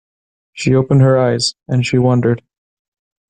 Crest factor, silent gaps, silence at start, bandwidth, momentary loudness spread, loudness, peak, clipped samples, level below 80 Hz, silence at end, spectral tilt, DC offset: 12 dB; none; 0.55 s; 9.6 kHz; 7 LU; -14 LUFS; -2 dBFS; under 0.1%; -50 dBFS; 0.95 s; -6 dB/octave; under 0.1%